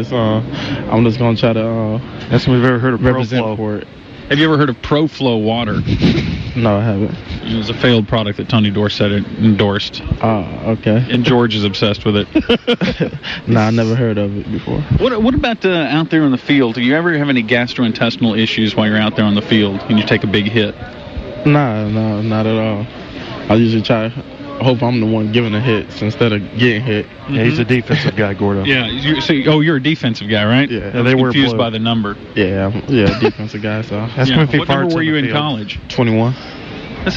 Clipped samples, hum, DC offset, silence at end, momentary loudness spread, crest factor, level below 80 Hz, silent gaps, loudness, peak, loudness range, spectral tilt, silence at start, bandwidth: under 0.1%; none; under 0.1%; 0 s; 8 LU; 12 dB; -36 dBFS; none; -15 LUFS; -2 dBFS; 2 LU; -7.5 dB/octave; 0 s; 7.4 kHz